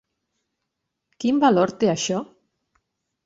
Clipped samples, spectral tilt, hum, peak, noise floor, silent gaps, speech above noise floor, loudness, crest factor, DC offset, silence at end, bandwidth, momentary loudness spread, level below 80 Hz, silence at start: under 0.1%; -5 dB/octave; none; -4 dBFS; -80 dBFS; none; 60 dB; -21 LUFS; 20 dB; under 0.1%; 1 s; 8 kHz; 9 LU; -66 dBFS; 1.2 s